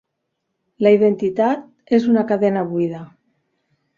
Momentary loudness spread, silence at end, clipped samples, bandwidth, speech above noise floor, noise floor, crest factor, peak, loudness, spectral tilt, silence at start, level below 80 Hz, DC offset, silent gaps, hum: 10 LU; 0.9 s; under 0.1%; 7.2 kHz; 59 dB; -75 dBFS; 16 dB; -2 dBFS; -18 LUFS; -8.5 dB/octave; 0.8 s; -64 dBFS; under 0.1%; none; none